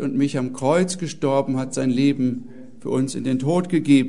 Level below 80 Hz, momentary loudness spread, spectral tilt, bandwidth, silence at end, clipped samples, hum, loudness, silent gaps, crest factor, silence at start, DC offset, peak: -60 dBFS; 6 LU; -6 dB/octave; 11 kHz; 0 s; under 0.1%; none; -22 LUFS; none; 16 dB; 0 s; 0.9%; -4 dBFS